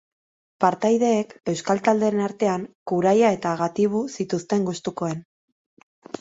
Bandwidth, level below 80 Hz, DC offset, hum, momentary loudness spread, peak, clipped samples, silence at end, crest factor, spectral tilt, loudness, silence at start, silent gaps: 8 kHz; -66 dBFS; under 0.1%; none; 9 LU; -4 dBFS; under 0.1%; 0.05 s; 18 dB; -6 dB/octave; -23 LUFS; 0.6 s; 2.75-2.86 s, 5.25-5.77 s, 5.83-6.02 s